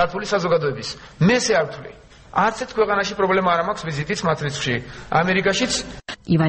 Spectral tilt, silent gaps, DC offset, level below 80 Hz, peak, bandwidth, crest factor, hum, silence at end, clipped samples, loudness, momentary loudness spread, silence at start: -4.5 dB/octave; none; under 0.1%; -48 dBFS; -4 dBFS; 8.8 kHz; 18 dB; none; 0 s; under 0.1%; -21 LUFS; 11 LU; 0 s